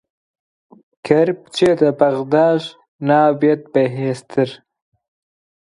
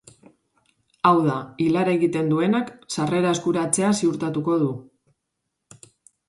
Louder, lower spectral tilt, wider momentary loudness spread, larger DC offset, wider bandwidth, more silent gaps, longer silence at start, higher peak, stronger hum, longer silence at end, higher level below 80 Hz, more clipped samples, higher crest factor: first, -17 LUFS vs -22 LUFS; first, -7 dB/octave vs -5.5 dB/octave; first, 9 LU vs 6 LU; neither; about the same, 11.5 kHz vs 11.5 kHz; first, 2.88-2.99 s vs none; about the same, 1.05 s vs 1.05 s; about the same, 0 dBFS vs -2 dBFS; neither; second, 1.1 s vs 1.45 s; about the same, -60 dBFS vs -64 dBFS; neither; about the same, 18 dB vs 20 dB